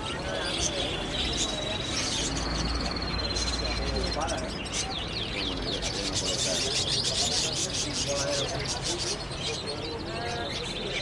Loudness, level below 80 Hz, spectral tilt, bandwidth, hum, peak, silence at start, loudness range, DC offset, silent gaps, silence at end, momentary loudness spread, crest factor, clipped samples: -28 LUFS; -40 dBFS; -2.5 dB/octave; 11.5 kHz; none; -14 dBFS; 0 s; 3 LU; under 0.1%; none; 0 s; 6 LU; 16 dB; under 0.1%